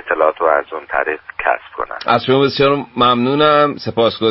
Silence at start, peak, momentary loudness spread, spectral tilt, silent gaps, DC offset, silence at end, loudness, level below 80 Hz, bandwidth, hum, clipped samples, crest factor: 0.05 s; 0 dBFS; 9 LU; -8.5 dB/octave; none; under 0.1%; 0 s; -15 LUFS; -50 dBFS; 5.8 kHz; none; under 0.1%; 14 dB